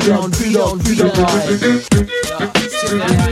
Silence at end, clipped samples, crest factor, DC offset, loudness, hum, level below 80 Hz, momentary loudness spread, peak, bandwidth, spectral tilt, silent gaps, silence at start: 0 s; under 0.1%; 14 dB; under 0.1%; -15 LUFS; none; -30 dBFS; 4 LU; 0 dBFS; 16 kHz; -5 dB/octave; none; 0 s